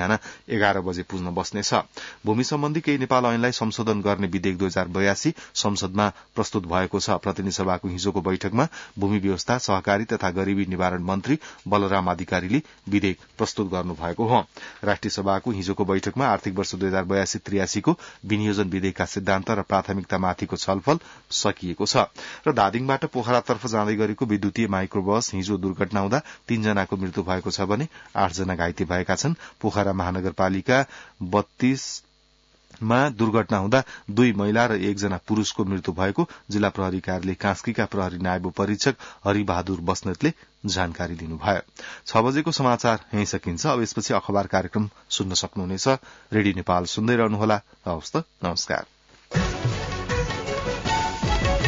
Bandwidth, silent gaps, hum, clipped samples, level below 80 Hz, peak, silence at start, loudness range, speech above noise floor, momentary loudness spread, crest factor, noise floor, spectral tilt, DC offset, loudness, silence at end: 7.8 kHz; none; none; under 0.1%; -44 dBFS; -6 dBFS; 0 s; 2 LU; 36 dB; 6 LU; 18 dB; -60 dBFS; -5 dB/octave; under 0.1%; -24 LUFS; 0 s